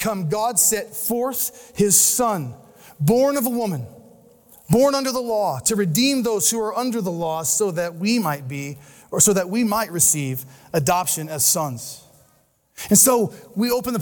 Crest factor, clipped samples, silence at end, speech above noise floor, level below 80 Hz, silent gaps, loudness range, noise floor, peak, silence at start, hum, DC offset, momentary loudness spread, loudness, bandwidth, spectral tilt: 18 dB; under 0.1%; 0 s; 40 dB; -56 dBFS; none; 2 LU; -61 dBFS; -2 dBFS; 0 s; none; under 0.1%; 12 LU; -19 LUFS; 19.5 kHz; -3.5 dB/octave